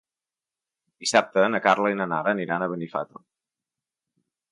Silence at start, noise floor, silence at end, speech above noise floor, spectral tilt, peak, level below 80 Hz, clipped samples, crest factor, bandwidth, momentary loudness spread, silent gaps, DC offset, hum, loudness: 1 s; under -90 dBFS; 1.45 s; over 66 dB; -4 dB/octave; -4 dBFS; -74 dBFS; under 0.1%; 22 dB; 11.5 kHz; 11 LU; none; under 0.1%; none; -24 LUFS